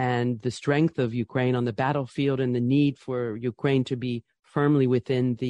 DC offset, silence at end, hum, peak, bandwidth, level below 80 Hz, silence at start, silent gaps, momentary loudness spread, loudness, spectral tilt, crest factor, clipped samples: under 0.1%; 0 s; none; -10 dBFS; 9.8 kHz; -62 dBFS; 0 s; none; 8 LU; -25 LUFS; -7.5 dB/octave; 14 dB; under 0.1%